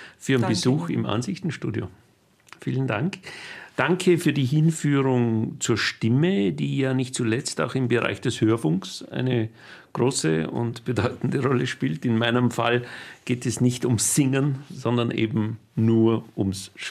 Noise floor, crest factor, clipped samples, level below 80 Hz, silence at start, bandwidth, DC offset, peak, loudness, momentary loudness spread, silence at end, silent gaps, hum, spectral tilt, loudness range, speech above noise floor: -52 dBFS; 20 dB; under 0.1%; -62 dBFS; 0 s; 15 kHz; under 0.1%; -4 dBFS; -24 LUFS; 9 LU; 0 s; none; none; -5.5 dB/octave; 4 LU; 29 dB